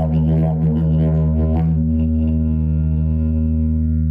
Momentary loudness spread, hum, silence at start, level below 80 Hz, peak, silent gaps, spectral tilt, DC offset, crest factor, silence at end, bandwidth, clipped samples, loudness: 2 LU; none; 0 s; -22 dBFS; -8 dBFS; none; -12.5 dB/octave; under 0.1%; 8 dB; 0 s; 3.2 kHz; under 0.1%; -18 LUFS